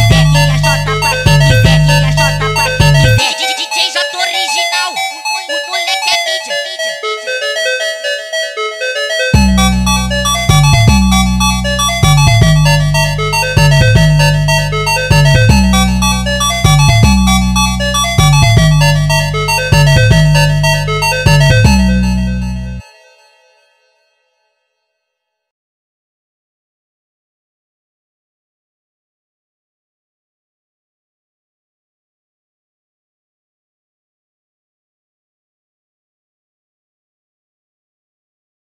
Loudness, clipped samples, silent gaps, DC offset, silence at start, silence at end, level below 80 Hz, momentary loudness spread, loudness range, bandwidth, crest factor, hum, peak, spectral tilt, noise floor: -10 LUFS; 0.1%; none; under 0.1%; 0 s; 15.95 s; -20 dBFS; 8 LU; 5 LU; 16.5 kHz; 12 dB; none; 0 dBFS; -4.5 dB/octave; -73 dBFS